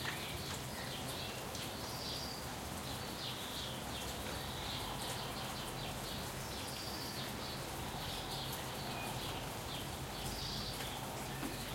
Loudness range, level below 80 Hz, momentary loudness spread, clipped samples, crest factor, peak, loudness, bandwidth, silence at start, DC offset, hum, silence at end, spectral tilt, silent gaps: 0 LU; -56 dBFS; 2 LU; under 0.1%; 18 dB; -24 dBFS; -42 LUFS; 16.5 kHz; 0 s; under 0.1%; none; 0 s; -3.5 dB/octave; none